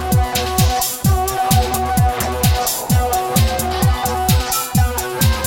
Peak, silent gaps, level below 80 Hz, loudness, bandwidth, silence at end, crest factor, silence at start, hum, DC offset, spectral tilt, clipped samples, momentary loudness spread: -2 dBFS; none; -22 dBFS; -17 LUFS; 17 kHz; 0 s; 14 dB; 0 s; none; under 0.1%; -4.5 dB/octave; under 0.1%; 2 LU